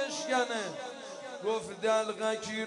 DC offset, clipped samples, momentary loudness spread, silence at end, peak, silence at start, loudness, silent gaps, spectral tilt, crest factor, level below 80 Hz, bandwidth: under 0.1%; under 0.1%; 12 LU; 0 s; -16 dBFS; 0 s; -33 LUFS; none; -2.5 dB/octave; 18 dB; -78 dBFS; 11 kHz